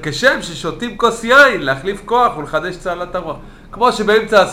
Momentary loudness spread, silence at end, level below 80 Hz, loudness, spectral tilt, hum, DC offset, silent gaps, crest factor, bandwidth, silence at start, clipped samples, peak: 14 LU; 0 s; -40 dBFS; -15 LUFS; -4 dB/octave; none; under 0.1%; none; 14 dB; 16 kHz; 0 s; under 0.1%; 0 dBFS